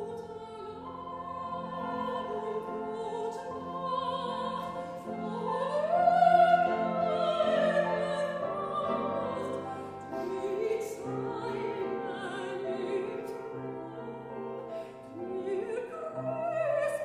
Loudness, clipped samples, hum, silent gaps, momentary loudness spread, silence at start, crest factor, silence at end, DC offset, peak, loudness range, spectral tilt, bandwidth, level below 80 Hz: -32 LUFS; under 0.1%; none; none; 14 LU; 0 s; 20 dB; 0 s; under 0.1%; -12 dBFS; 11 LU; -6 dB/octave; 13.5 kHz; -68 dBFS